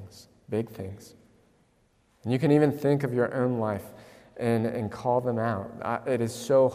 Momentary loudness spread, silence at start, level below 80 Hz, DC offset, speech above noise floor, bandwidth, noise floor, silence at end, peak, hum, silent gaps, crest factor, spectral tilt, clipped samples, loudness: 17 LU; 0 s; -66 dBFS; under 0.1%; 40 dB; 15.5 kHz; -66 dBFS; 0 s; -10 dBFS; none; none; 18 dB; -7.5 dB/octave; under 0.1%; -27 LUFS